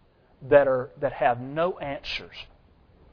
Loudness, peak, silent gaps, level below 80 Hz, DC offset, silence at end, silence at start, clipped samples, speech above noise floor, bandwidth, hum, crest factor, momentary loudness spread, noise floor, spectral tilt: -25 LUFS; -4 dBFS; none; -52 dBFS; under 0.1%; 0.7 s; 0.4 s; under 0.1%; 32 dB; 5.4 kHz; none; 22 dB; 14 LU; -57 dBFS; -6.5 dB/octave